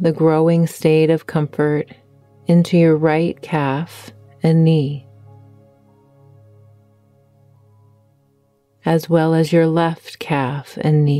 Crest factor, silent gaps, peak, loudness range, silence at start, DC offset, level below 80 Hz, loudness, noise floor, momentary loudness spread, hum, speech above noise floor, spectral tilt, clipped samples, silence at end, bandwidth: 16 dB; none; -2 dBFS; 7 LU; 0 s; under 0.1%; -62 dBFS; -17 LUFS; -60 dBFS; 11 LU; none; 44 dB; -8 dB/octave; under 0.1%; 0 s; 13.5 kHz